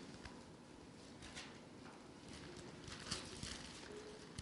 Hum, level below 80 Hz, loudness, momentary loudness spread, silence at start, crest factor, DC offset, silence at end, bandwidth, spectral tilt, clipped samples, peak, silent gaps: none; -66 dBFS; -52 LUFS; 11 LU; 0 s; 26 dB; under 0.1%; 0 s; 11.5 kHz; -3.5 dB/octave; under 0.1%; -28 dBFS; none